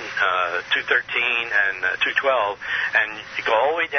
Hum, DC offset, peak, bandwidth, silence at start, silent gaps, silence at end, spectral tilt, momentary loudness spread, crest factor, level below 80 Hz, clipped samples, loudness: none; under 0.1%; -4 dBFS; 6.6 kHz; 0 s; none; 0 s; -2 dB/octave; 4 LU; 18 dB; -62 dBFS; under 0.1%; -20 LUFS